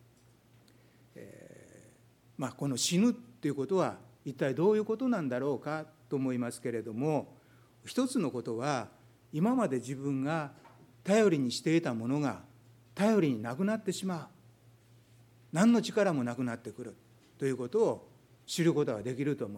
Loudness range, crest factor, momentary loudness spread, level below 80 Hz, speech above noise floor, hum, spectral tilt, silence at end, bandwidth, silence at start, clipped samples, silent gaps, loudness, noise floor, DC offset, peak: 4 LU; 20 dB; 17 LU; -76 dBFS; 32 dB; none; -5.5 dB/octave; 0 s; 16.5 kHz; 1.15 s; under 0.1%; none; -32 LUFS; -63 dBFS; under 0.1%; -12 dBFS